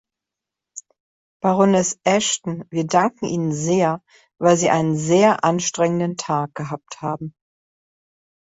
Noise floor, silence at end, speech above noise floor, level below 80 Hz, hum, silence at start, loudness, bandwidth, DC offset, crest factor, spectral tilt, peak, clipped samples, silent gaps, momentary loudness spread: -86 dBFS; 1.15 s; 66 dB; -62 dBFS; none; 0.75 s; -20 LUFS; 8 kHz; under 0.1%; 18 dB; -5 dB/octave; -2 dBFS; under 0.1%; 1.00-1.40 s; 15 LU